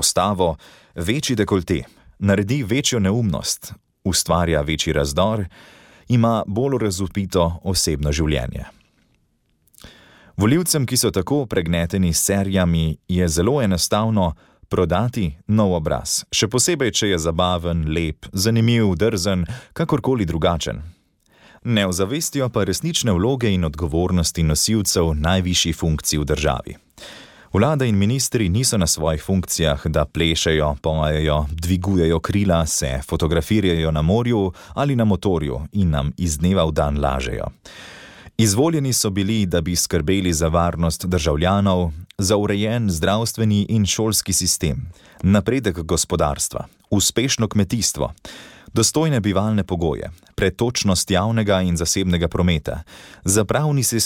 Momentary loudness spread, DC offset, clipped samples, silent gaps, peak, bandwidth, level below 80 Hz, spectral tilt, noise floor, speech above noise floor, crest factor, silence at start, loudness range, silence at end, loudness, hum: 8 LU; under 0.1%; under 0.1%; none; -4 dBFS; 17.5 kHz; -34 dBFS; -4.5 dB/octave; -64 dBFS; 45 dB; 14 dB; 0 s; 2 LU; 0 s; -20 LUFS; none